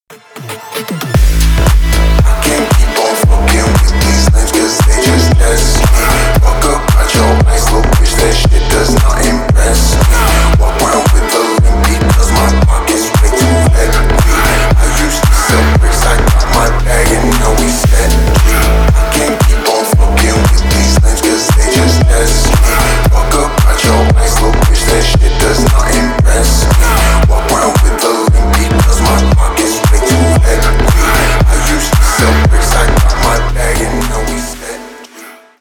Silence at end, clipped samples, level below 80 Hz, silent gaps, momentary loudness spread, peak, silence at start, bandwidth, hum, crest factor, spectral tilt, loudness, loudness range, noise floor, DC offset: 0.3 s; under 0.1%; -10 dBFS; none; 3 LU; 0 dBFS; 0.1 s; 19 kHz; none; 8 dB; -4.5 dB/octave; -10 LUFS; 1 LU; -34 dBFS; under 0.1%